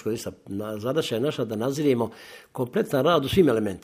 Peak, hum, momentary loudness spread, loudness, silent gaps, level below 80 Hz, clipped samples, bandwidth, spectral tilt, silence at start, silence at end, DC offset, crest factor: -6 dBFS; none; 13 LU; -25 LUFS; none; -54 dBFS; under 0.1%; 15.5 kHz; -6 dB/octave; 0.05 s; 0.05 s; under 0.1%; 18 dB